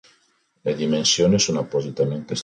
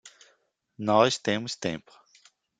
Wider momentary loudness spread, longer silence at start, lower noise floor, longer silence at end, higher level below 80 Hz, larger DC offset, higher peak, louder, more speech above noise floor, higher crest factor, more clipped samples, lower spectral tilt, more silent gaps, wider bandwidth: second, 9 LU vs 12 LU; first, 0.65 s vs 0.05 s; second, -64 dBFS vs -69 dBFS; second, 0 s vs 0.8 s; first, -54 dBFS vs -68 dBFS; neither; about the same, -6 dBFS vs -6 dBFS; first, -21 LUFS vs -26 LUFS; about the same, 43 dB vs 43 dB; second, 16 dB vs 24 dB; neither; about the same, -4 dB/octave vs -4 dB/octave; neither; about the same, 10.5 kHz vs 9.6 kHz